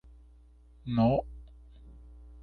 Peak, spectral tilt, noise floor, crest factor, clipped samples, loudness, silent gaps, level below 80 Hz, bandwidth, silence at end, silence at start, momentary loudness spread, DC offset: -14 dBFS; -10.5 dB/octave; -56 dBFS; 18 dB; under 0.1%; -29 LUFS; none; -50 dBFS; 4.6 kHz; 0 s; 0.85 s; 27 LU; under 0.1%